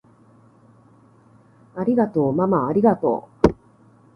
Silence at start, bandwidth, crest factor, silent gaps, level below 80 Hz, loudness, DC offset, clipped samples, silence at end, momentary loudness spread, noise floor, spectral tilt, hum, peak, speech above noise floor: 1.75 s; 7 kHz; 22 dB; none; -44 dBFS; -20 LUFS; under 0.1%; under 0.1%; 0.65 s; 8 LU; -53 dBFS; -9.5 dB/octave; none; 0 dBFS; 34 dB